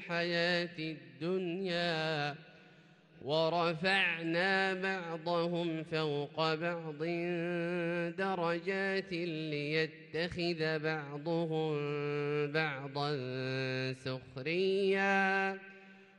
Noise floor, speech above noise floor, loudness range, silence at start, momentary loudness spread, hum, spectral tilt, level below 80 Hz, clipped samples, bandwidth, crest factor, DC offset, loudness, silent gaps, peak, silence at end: -61 dBFS; 27 dB; 3 LU; 0 s; 8 LU; none; -6 dB/octave; -74 dBFS; under 0.1%; 10.5 kHz; 18 dB; under 0.1%; -34 LUFS; none; -16 dBFS; 0.15 s